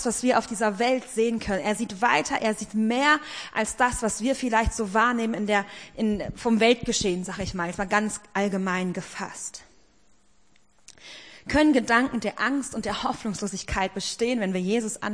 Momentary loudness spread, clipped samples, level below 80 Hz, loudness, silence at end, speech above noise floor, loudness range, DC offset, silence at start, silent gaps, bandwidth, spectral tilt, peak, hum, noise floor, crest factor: 10 LU; under 0.1%; -46 dBFS; -25 LUFS; 0 s; 38 dB; 5 LU; 0.1%; 0 s; none; 10.5 kHz; -4 dB/octave; -6 dBFS; none; -64 dBFS; 20 dB